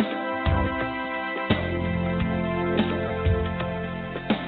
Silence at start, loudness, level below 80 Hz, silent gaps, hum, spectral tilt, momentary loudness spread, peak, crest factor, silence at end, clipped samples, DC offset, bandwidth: 0 s; -26 LUFS; -38 dBFS; none; none; -5.5 dB/octave; 5 LU; -6 dBFS; 20 dB; 0 s; under 0.1%; under 0.1%; 4.6 kHz